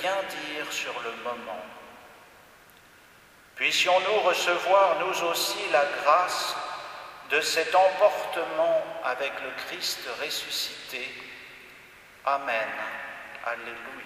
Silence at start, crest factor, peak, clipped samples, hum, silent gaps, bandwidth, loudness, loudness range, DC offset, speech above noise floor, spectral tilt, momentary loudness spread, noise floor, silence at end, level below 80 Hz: 0 s; 20 dB; -8 dBFS; under 0.1%; none; none; 15.5 kHz; -26 LUFS; 9 LU; under 0.1%; 28 dB; -1 dB/octave; 17 LU; -54 dBFS; 0 s; -70 dBFS